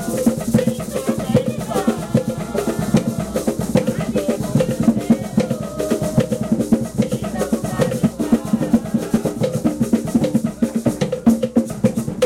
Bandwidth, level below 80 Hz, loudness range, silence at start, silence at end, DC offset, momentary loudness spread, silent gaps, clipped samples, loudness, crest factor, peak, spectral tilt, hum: 16 kHz; -42 dBFS; 1 LU; 0 s; 0 s; under 0.1%; 4 LU; none; under 0.1%; -19 LUFS; 16 dB; -4 dBFS; -6.5 dB/octave; none